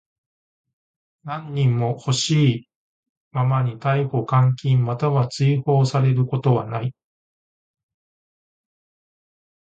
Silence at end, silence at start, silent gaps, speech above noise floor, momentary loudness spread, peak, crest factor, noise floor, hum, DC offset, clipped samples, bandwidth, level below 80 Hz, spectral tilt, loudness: 2.75 s; 1.25 s; 2.76-3.03 s, 3.09-3.31 s; over 71 dB; 11 LU; -6 dBFS; 18 dB; under -90 dBFS; none; under 0.1%; under 0.1%; 8.8 kHz; -58 dBFS; -6.5 dB/octave; -21 LUFS